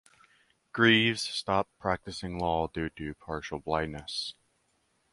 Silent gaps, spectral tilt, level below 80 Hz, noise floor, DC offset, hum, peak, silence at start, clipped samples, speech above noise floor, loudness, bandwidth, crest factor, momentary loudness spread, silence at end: none; -4.5 dB/octave; -52 dBFS; -73 dBFS; under 0.1%; none; -8 dBFS; 0.75 s; under 0.1%; 43 dB; -29 LUFS; 11.5 kHz; 24 dB; 15 LU; 0.8 s